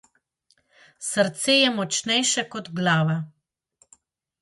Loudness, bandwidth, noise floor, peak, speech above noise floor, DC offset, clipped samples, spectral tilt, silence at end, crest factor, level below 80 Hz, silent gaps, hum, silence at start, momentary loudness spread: -22 LUFS; 11.5 kHz; -68 dBFS; -6 dBFS; 45 dB; under 0.1%; under 0.1%; -3 dB/octave; 1.15 s; 18 dB; -70 dBFS; none; none; 1 s; 13 LU